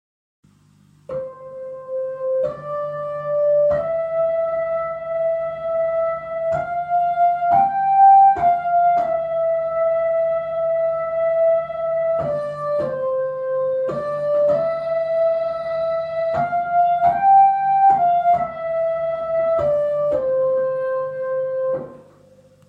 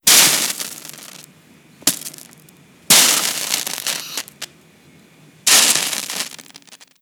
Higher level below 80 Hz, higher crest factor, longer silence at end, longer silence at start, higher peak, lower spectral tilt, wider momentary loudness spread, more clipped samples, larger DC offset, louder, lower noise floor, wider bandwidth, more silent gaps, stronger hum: first, -56 dBFS vs -66 dBFS; second, 14 dB vs 20 dB; first, 0.65 s vs 0.25 s; first, 1.1 s vs 0.05 s; second, -4 dBFS vs 0 dBFS; first, -7.5 dB/octave vs 1 dB/octave; second, 10 LU vs 23 LU; neither; neither; second, -19 LUFS vs -14 LUFS; first, -54 dBFS vs -49 dBFS; second, 5.2 kHz vs over 20 kHz; neither; first, 50 Hz at -50 dBFS vs none